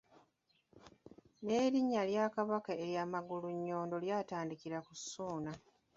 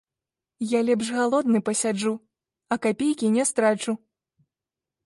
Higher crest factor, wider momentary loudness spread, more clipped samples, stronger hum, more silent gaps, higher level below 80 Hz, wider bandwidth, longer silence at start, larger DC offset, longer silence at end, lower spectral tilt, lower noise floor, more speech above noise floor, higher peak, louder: about the same, 18 dB vs 16 dB; about the same, 11 LU vs 9 LU; neither; neither; neither; second, -78 dBFS vs -70 dBFS; second, 7.6 kHz vs 11.5 kHz; first, 0.75 s vs 0.6 s; neither; second, 0.35 s vs 1.1 s; about the same, -5 dB/octave vs -4 dB/octave; second, -78 dBFS vs -89 dBFS; second, 40 dB vs 66 dB; second, -22 dBFS vs -10 dBFS; second, -38 LUFS vs -24 LUFS